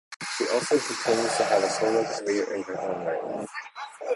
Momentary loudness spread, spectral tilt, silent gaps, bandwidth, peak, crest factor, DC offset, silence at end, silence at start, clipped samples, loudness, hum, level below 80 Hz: 12 LU; -3 dB/octave; 0.16-0.20 s; 11.5 kHz; -10 dBFS; 18 dB; under 0.1%; 0 s; 0.1 s; under 0.1%; -26 LUFS; none; -70 dBFS